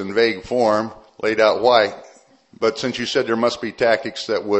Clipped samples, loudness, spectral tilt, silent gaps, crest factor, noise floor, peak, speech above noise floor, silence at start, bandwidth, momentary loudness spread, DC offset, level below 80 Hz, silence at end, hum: under 0.1%; -19 LUFS; -4 dB/octave; none; 20 dB; -50 dBFS; 0 dBFS; 31 dB; 0 s; 8.4 kHz; 8 LU; under 0.1%; -56 dBFS; 0 s; none